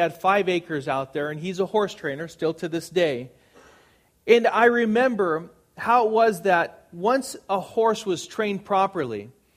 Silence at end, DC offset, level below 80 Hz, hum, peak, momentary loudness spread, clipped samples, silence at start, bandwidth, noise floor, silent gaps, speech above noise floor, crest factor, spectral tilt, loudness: 0.25 s; under 0.1%; -66 dBFS; none; -4 dBFS; 12 LU; under 0.1%; 0 s; 15.5 kHz; -59 dBFS; none; 36 dB; 20 dB; -5 dB/octave; -23 LUFS